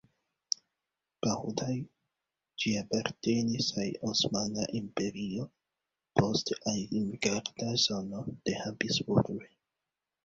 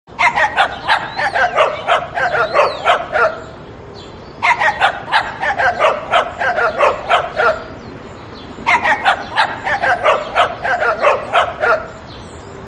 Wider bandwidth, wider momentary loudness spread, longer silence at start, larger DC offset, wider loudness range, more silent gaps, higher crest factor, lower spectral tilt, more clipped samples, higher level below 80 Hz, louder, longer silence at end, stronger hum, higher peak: second, 7.8 kHz vs 11.5 kHz; second, 9 LU vs 19 LU; first, 1.25 s vs 0.1 s; neither; about the same, 2 LU vs 2 LU; neither; first, 26 dB vs 16 dB; about the same, -4 dB/octave vs -3.5 dB/octave; neither; second, -64 dBFS vs -44 dBFS; second, -32 LUFS vs -15 LUFS; first, 0.8 s vs 0 s; neither; second, -8 dBFS vs 0 dBFS